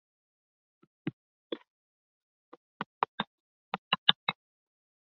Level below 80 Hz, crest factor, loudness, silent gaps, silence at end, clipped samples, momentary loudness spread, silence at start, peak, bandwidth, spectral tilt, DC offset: -78 dBFS; 36 dB; -32 LUFS; 1.13-1.50 s, 1.70-2.80 s, 2.86-3.01 s, 3.08-3.18 s, 3.27-3.72 s, 3.78-3.91 s, 3.98-4.07 s, 4.15-4.27 s; 0.8 s; under 0.1%; 18 LU; 1.05 s; -2 dBFS; 6.6 kHz; 0 dB/octave; under 0.1%